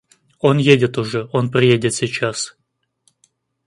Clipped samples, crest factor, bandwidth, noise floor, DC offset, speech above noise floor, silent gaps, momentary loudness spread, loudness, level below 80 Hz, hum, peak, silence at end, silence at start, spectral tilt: under 0.1%; 18 dB; 11.5 kHz; -63 dBFS; under 0.1%; 47 dB; none; 9 LU; -17 LUFS; -56 dBFS; none; 0 dBFS; 1.15 s; 0.45 s; -5 dB/octave